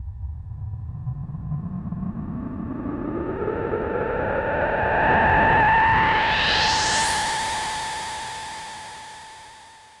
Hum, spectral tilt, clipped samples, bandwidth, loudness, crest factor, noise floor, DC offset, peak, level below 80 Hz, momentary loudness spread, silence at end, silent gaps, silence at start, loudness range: none; -3.5 dB/octave; under 0.1%; 11.5 kHz; -22 LUFS; 14 dB; -47 dBFS; under 0.1%; -8 dBFS; -40 dBFS; 18 LU; 0.15 s; none; 0 s; 11 LU